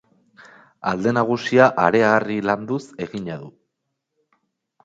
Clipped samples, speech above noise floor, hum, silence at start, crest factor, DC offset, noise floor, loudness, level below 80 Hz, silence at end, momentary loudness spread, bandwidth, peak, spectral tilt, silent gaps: under 0.1%; 59 dB; none; 0.85 s; 22 dB; under 0.1%; -78 dBFS; -20 LUFS; -60 dBFS; 1.35 s; 15 LU; 7.8 kHz; 0 dBFS; -6.5 dB/octave; none